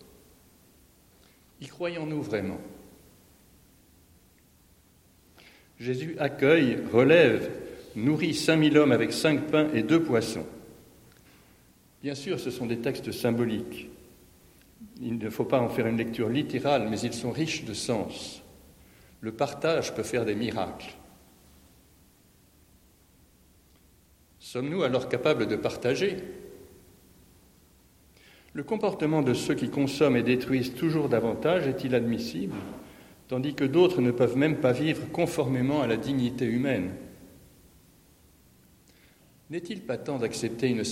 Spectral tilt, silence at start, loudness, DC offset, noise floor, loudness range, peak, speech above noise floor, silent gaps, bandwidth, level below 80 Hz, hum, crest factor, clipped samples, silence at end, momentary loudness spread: -6 dB/octave; 1.6 s; -27 LUFS; under 0.1%; -60 dBFS; 13 LU; -6 dBFS; 34 dB; none; 16.5 kHz; -60 dBFS; none; 22 dB; under 0.1%; 0 s; 17 LU